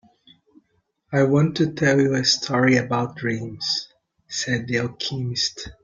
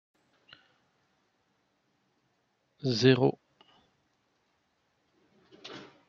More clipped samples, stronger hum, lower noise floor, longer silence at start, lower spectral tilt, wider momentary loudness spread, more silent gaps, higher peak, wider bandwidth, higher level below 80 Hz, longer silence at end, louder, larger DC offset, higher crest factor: neither; neither; second, -69 dBFS vs -75 dBFS; second, 1.1 s vs 2.85 s; second, -4.5 dB/octave vs -6.5 dB/octave; second, 9 LU vs 23 LU; neither; first, -4 dBFS vs -8 dBFS; first, 9.2 kHz vs 7.2 kHz; first, -56 dBFS vs -74 dBFS; second, 0.1 s vs 0.25 s; first, -22 LUFS vs -26 LUFS; neither; second, 18 dB vs 26 dB